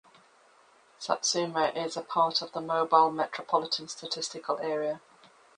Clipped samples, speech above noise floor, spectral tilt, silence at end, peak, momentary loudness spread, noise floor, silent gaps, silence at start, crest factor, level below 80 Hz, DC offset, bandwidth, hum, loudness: under 0.1%; 32 dB; -2.5 dB/octave; 0.6 s; -8 dBFS; 11 LU; -61 dBFS; none; 1 s; 22 dB; -78 dBFS; under 0.1%; 10.5 kHz; none; -29 LUFS